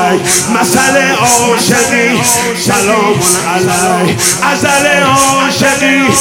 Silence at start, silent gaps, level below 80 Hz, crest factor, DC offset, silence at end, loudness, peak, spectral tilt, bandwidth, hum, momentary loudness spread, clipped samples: 0 s; none; -42 dBFS; 10 dB; under 0.1%; 0 s; -8 LUFS; 0 dBFS; -3 dB/octave; over 20 kHz; none; 2 LU; 0.7%